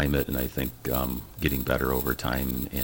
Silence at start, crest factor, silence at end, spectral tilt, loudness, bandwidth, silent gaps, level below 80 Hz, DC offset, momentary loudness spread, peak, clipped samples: 0 s; 18 dB; 0 s; -5.5 dB/octave; -28 LUFS; 17 kHz; none; -36 dBFS; under 0.1%; 4 LU; -8 dBFS; under 0.1%